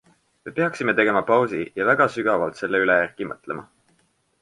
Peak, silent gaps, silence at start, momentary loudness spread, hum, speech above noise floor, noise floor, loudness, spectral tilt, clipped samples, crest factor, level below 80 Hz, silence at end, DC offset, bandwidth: -4 dBFS; none; 0.45 s; 14 LU; none; 44 dB; -65 dBFS; -21 LUFS; -6 dB/octave; under 0.1%; 18 dB; -62 dBFS; 0.8 s; under 0.1%; 11.5 kHz